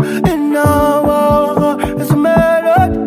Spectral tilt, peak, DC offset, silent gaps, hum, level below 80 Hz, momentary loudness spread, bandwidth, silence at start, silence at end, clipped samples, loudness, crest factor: -7 dB/octave; -2 dBFS; under 0.1%; none; none; -28 dBFS; 4 LU; 16 kHz; 0 s; 0 s; under 0.1%; -12 LUFS; 10 dB